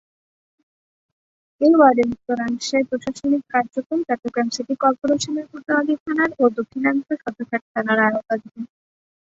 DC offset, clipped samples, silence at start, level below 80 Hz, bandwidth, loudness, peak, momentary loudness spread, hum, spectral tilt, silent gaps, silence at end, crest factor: under 0.1%; under 0.1%; 1.6 s; -62 dBFS; 8 kHz; -20 LUFS; -2 dBFS; 11 LU; none; -4.5 dB/octave; 3.86-3.90 s, 6.00-6.06 s, 7.62-7.75 s; 0.6 s; 18 dB